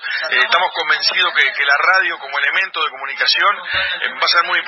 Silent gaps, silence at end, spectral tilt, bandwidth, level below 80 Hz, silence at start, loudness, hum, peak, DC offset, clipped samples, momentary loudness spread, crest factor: none; 0 s; -0.5 dB/octave; 11.5 kHz; -58 dBFS; 0 s; -15 LUFS; none; 0 dBFS; under 0.1%; under 0.1%; 6 LU; 16 dB